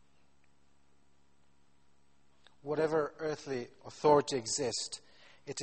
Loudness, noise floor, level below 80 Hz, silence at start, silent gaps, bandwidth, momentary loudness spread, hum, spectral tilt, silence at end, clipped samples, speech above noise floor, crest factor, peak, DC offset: -33 LUFS; -72 dBFS; -72 dBFS; 2.65 s; none; 8.8 kHz; 19 LU; 50 Hz at -80 dBFS; -3.5 dB/octave; 0 s; under 0.1%; 39 dB; 22 dB; -14 dBFS; under 0.1%